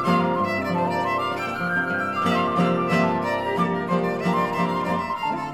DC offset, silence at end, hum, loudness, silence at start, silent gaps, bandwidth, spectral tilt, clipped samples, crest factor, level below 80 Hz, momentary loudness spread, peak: 0.2%; 0 s; none; -23 LUFS; 0 s; none; 13 kHz; -6.5 dB/octave; under 0.1%; 16 dB; -60 dBFS; 4 LU; -8 dBFS